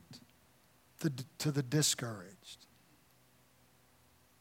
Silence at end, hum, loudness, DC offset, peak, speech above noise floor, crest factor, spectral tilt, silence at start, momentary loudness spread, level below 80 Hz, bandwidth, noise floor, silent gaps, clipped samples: 1.75 s; none; -35 LUFS; under 0.1%; -18 dBFS; 31 dB; 22 dB; -4 dB/octave; 0.1 s; 24 LU; -78 dBFS; 16.5 kHz; -67 dBFS; none; under 0.1%